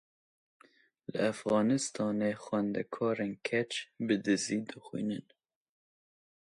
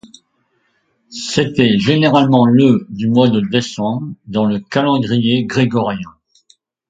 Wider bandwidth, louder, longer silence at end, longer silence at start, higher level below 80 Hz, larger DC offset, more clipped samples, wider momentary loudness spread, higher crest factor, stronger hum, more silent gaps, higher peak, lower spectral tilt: first, 11.5 kHz vs 9 kHz; second, -33 LUFS vs -14 LUFS; first, 1.25 s vs 0.8 s; about the same, 1.1 s vs 1.1 s; second, -76 dBFS vs -52 dBFS; neither; neither; second, 8 LU vs 11 LU; about the same, 18 dB vs 16 dB; neither; neither; second, -16 dBFS vs 0 dBFS; second, -4.5 dB/octave vs -6.5 dB/octave